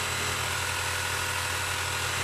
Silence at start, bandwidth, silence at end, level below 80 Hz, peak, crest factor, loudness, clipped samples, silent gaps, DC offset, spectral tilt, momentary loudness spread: 0 s; 14 kHz; 0 s; -52 dBFS; -16 dBFS; 14 dB; -28 LUFS; under 0.1%; none; under 0.1%; -1.5 dB/octave; 0 LU